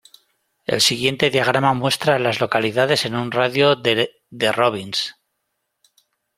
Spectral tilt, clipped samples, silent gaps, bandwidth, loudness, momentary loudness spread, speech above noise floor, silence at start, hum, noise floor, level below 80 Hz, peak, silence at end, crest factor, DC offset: -3.5 dB/octave; under 0.1%; none; 16 kHz; -18 LUFS; 8 LU; 56 dB; 0.7 s; none; -75 dBFS; -60 dBFS; -2 dBFS; 1.25 s; 18 dB; under 0.1%